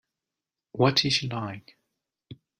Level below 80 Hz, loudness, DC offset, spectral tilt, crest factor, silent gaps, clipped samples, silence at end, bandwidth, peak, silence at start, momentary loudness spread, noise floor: -64 dBFS; -24 LUFS; under 0.1%; -4.5 dB/octave; 22 dB; none; under 0.1%; 0.25 s; 16 kHz; -8 dBFS; 0.75 s; 20 LU; -89 dBFS